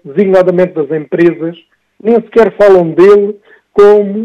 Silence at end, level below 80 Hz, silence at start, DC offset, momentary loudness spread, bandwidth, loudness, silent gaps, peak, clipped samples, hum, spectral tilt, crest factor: 0 s; -48 dBFS; 0.05 s; under 0.1%; 11 LU; 7.2 kHz; -9 LUFS; none; 0 dBFS; 3%; none; -8 dB/octave; 8 dB